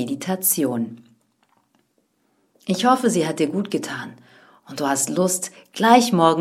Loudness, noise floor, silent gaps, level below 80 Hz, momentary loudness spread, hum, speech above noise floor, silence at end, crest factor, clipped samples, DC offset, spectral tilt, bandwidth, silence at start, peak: -20 LUFS; -67 dBFS; none; -68 dBFS; 16 LU; none; 47 dB; 0 s; 22 dB; under 0.1%; under 0.1%; -4 dB/octave; 16.5 kHz; 0 s; 0 dBFS